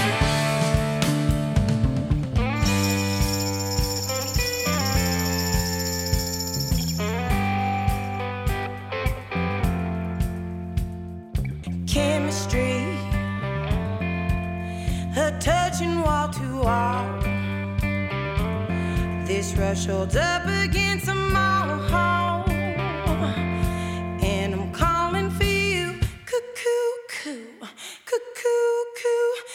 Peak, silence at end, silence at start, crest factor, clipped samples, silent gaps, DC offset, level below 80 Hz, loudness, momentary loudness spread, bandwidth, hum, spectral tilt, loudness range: -4 dBFS; 0 s; 0 s; 20 dB; under 0.1%; none; under 0.1%; -32 dBFS; -24 LUFS; 7 LU; 16.5 kHz; none; -5 dB/octave; 4 LU